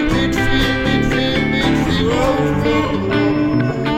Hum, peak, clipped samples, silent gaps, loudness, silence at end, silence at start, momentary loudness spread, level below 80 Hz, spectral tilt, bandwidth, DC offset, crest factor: none; -4 dBFS; under 0.1%; none; -16 LUFS; 0 s; 0 s; 1 LU; -28 dBFS; -6 dB/octave; 16 kHz; under 0.1%; 12 dB